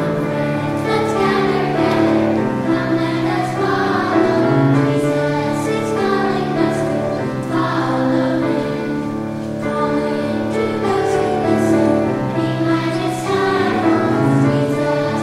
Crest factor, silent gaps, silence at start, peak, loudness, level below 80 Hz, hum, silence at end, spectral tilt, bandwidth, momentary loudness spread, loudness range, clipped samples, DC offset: 14 dB; none; 0 s; -2 dBFS; -17 LUFS; -48 dBFS; none; 0 s; -7 dB/octave; 13.5 kHz; 5 LU; 3 LU; under 0.1%; under 0.1%